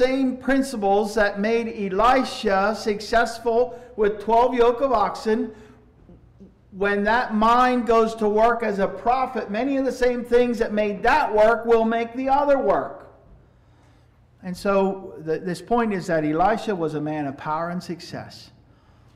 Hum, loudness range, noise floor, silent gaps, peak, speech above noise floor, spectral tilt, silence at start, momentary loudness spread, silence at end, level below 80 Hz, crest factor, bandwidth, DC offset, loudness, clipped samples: none; 5 LU; -55 dBFS; none; -10 dBFS; 34 dB; -5.5 dB/octave; 0 s; 9 LU; 0.7 s; -44 dBFS; 12 dB; 14 kHz; under 0.1%; -21 LUFS; under 0.1%